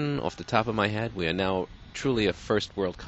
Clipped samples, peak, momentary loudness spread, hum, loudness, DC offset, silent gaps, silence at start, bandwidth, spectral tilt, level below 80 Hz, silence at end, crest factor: under 0.1%; -6 dBFS; 6 LU; none; -28 LUFS; under 0.1%; none; 0 s; 8.2 kHz; -5.5 dB/octave; -50 dBFS; 0 s; 22 dB